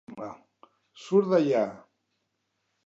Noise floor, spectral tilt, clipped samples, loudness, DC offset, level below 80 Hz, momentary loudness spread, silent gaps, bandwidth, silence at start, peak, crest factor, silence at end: -78 dBFS; -7 dB/octave; under 0.1%; -25 LUFS; under 0.1%; -78 dBFS; 19 LU; none; 7.8 kHz; 0.1 s; -10 dBFS; 18 dB; 1.1 s